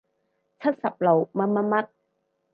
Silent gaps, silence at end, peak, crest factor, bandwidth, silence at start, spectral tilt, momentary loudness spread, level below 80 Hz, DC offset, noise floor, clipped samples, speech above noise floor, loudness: none; 0.7 s; -8 dBFS; 18 dB; 5 kHz; 0.6 s; -10.5 dB/octave; 6 LU; -78 dBFS; under 0.1%; -74 dBFS; under 0.1%; 51 dB; -24 LUFS